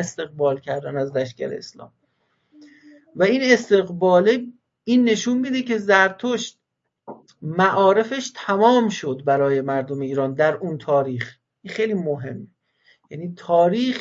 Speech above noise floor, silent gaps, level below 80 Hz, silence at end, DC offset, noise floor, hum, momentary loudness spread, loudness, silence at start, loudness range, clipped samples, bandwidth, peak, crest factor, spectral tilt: 48 dB; none; -70 dBFS; 0 s; under 0.1%; -68 dBFS; none; 17 LU; -20 LUFS; 0 s; 6 LU; under 0.1%; 7.8 kHz; -2 dBFS; 20 dB; -5.5 dB/octave